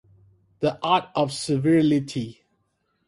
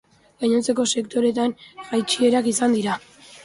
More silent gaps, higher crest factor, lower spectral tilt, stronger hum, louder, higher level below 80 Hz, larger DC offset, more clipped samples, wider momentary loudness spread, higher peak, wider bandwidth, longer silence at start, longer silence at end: neither; about the same, 16 dB vs 16 dB; first, -6 dB/octave vs -3.5 dB/octave; neither; about the same, -23 LUFS vs -21 LUFS; about the same, -60 dBFS vs -64 dBFS; neither; neither; first, 12 LU vs 8 LU; about the same, -8 dBFS vs -6 dBFS; about the same, 11.5 kHz vs 11.5 kHz; first, 0.6 s vs 0.4 s; first, 0.75 s vs 0.05 s